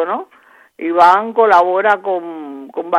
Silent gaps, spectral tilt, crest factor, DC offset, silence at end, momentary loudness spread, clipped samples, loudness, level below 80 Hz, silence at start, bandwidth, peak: none; -5 dB/octave; 14 dB; under 0.1%; 0 s; 17 LU; under 0.1%; -13 LUFS; -62 dBFS; 0 s; 10.5 kHz; 0 dBFS